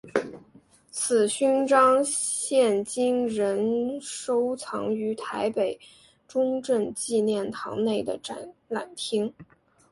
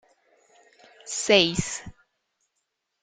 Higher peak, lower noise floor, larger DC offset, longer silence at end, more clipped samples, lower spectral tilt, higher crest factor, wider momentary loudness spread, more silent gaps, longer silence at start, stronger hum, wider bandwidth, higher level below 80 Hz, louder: about the same, -6 dBFS vs -4 dBFS; second, -57 dBFS vs -79 dBFS; neither; second, 0.5 s vs 1.1 s; neither; about the same, -3.5 dB/octave vs -3 dB/octave; about the same, 20 dB vs 24 dB; second, 12 LU vs 17 LU; neither; second, 0.05 s vs 1.05 s; neither; first, 11.5 kHz vs 9.6 kHz; second, -68 dBFS vs -54 dBFS; second, -26 LUFS vs -22 LUFS